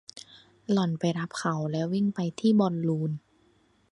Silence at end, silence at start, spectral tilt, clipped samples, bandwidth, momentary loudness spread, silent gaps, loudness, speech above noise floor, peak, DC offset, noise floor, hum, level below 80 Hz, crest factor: 0.75 s; 0.15 s; -7 dB/octave; under 0.1%; 11 kHz; 16 LU; none; -28 LUFS; 38 dB; -12 dBFS; under 0.1%; -65 dBFS; none; -70 dBFS; 18 dB